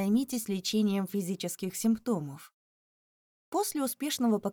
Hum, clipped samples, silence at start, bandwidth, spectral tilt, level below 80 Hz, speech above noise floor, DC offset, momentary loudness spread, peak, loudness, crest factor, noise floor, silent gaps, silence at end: none; under 0.1%; 0 s; over 20 kHz; -5 dB/octave; -72 dBFS; over 60 dB; under 0.1%; 6 LU; -16 dBFS; -31 LUFS; 14 dB; under -90 dBFS; 2.53-3.52 s; 0 s